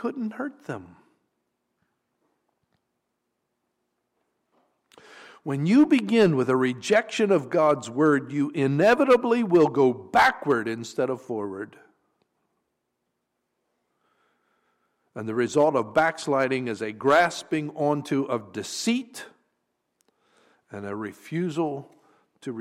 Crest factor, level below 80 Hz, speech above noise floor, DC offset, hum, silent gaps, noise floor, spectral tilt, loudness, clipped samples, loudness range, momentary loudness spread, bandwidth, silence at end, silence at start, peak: 16 dB; -66 dBFS; 56 dB; under 0.1%; none; none; -79 dBFS; -5.5 dB/octave; -23 LUFS; under 0.1%; 13 LU; 17 LU; 15.5 kHz; 0 s; 0 s; -10 dBFS